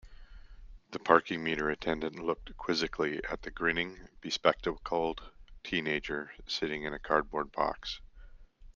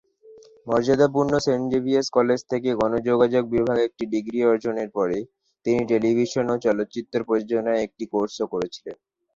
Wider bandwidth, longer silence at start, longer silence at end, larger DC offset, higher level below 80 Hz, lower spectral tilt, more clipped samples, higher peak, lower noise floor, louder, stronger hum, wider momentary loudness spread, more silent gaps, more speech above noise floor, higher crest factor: about the same, 7.4 kHz vs 7.8 kHz; second, 0.05 s vs 0.25 s; second, 0.05 s vs 0.4 s; neither; about the same, -52 dBFS vs -56 dBFS; second, -4.5 dB/octave vs -6 dB/octave; neither; about the same, -6 dBFS vs -6 dBFS; about the same, -52 dBFS vs -50 dBFS; second, -33 LUFS vs -23 LUFS; neither; first, 11 LU vs 8 LU; neither; second, 20 dB vs 28 dB; first, 28 dB vs 18 dB